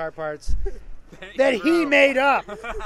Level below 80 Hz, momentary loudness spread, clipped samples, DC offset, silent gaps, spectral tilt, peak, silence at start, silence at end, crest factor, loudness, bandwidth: -34 dBFS; 17 LU; under 0.1%; under 0.1%; none; -5 dB/octave; -4 dBFS; 0 s; 0 s; 18 dB; -19 LUFS; 12.5 kHz